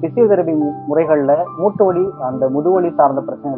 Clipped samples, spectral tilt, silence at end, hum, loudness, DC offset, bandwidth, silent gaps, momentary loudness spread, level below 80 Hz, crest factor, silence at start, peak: under 0.1%; -10 dB/octave; 0 s; none; -15 LUFS; under 0.1%; 3 kHz; none; 6 LU; -60 dBFS; 14 dB; 0 s; 0 dBFS